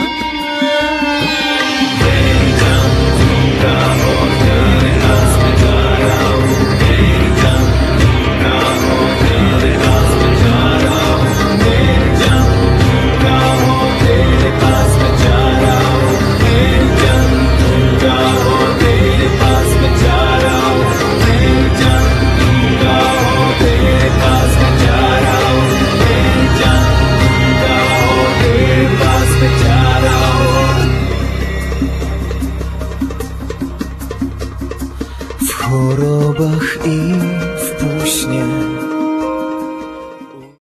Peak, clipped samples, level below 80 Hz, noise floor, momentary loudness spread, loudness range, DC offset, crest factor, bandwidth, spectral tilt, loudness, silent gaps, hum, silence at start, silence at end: 0 dBFS; under 0.1%; -18 dBFS; -33 dBFS; 9 LU; 6 LU; under 0.1%; 10 dB; 14 kHz; -5.5 dB/octave; -12 LUFS; none; none; 0 s; 0.3 s